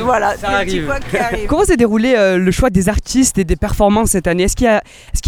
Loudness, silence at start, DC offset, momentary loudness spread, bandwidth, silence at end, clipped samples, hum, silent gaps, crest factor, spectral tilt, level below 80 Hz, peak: -14 LUFS; 0 s; under 0.1%; 6 LU; 19 kHz; 0 s; under 0.1%; none; none; 14 dB; -5 dB/octave; -24 dBFS; 0 dBFS